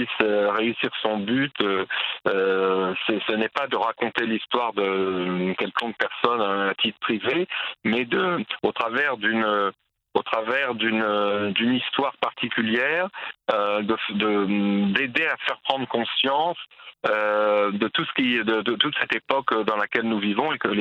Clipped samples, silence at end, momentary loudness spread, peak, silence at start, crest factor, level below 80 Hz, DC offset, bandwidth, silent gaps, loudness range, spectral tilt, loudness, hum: under 0.1%; 0 s; 4 LU; -2 dBFS; 0 s; 22 dB; -70 dBFS; under 0.1%; 7.6 kHz; none; 1 LU; -6.5 dB/octave; -23 LUFS; none